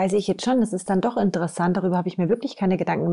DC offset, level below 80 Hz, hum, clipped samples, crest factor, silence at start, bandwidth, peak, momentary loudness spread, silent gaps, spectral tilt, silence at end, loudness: 0.2%; -58 dBFS; none; under 0.1%; 12 dB; 0 s; 11.5 kHz; -10 dBFS; 2 LU; none; -6.5 dB/octave; 0 s; -23 LUFS